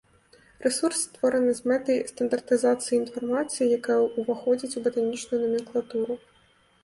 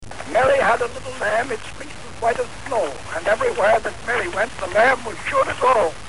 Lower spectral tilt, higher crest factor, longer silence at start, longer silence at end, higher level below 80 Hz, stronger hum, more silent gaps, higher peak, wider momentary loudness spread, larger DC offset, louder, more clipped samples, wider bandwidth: about the same, -3.5 dB/octave vs -3.5 dB/octave; about the same, 16 dB vs 14 dB; first, 0.6 s vs 0 s; first, 0.65 s vs 0 s; second, -68 dBFS vs -46 dBFS; neither; neither; second, -10 dBFS vs -6 dBFS; second, 6 LU vs 10 LU; second, under 0.1% vs 2%; second, -26 LUFS vs -20 LUFS; neither; about the same, 11.5 kHz vs 11.5 kHz